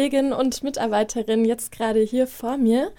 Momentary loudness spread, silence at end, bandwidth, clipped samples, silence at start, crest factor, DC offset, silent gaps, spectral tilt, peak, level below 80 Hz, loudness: 4 LU; 0.05 s; 17.5 kHz; under 0.1%; 0 s; 12 dB; under 0.1%; none; -4.5 dB/octave; -8 dBFS; -52 dBFS; -22 LUFS